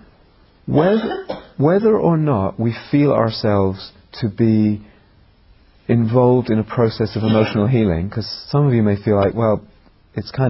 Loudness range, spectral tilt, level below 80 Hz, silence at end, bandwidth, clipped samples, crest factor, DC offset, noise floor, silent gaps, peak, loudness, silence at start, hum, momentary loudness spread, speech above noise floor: 2 LU; -12 dB/octave; -42 dBFS; 0 s; 5.8 kHz; under 0.1%; 16 dB; under 0.1%; -51 dBFS; none; -2 dBFS; -17 LUFS; 0.65 s; none; 13 LU; 35 dB